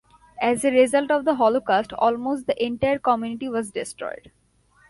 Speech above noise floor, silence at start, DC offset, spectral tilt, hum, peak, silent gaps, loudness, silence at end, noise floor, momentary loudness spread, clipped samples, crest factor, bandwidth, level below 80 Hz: 38 dB; 0.4 s; under 0.1%; -4.5 dB/octave; none; -6 dBFS; none; -22 LUFS; 0.75 s; -60 dBFS; 12 LU; under 0.1%; 16 dB; 11.5 kHz; -58 dBFS